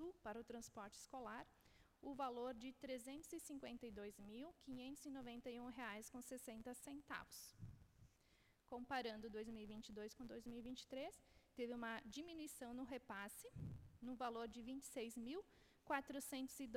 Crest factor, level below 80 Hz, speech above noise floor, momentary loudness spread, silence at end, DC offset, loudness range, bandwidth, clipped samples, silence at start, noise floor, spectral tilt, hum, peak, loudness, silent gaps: 24 dB; -74 dBFS; 24 dB; 9 LU; 0 s; under 0.1%; 3 LU; 16.5 kHz; under 0.1%; 0 s; -77 dBFS; -4 dB/octave; none; -30 dBFS; -53 LUFS; none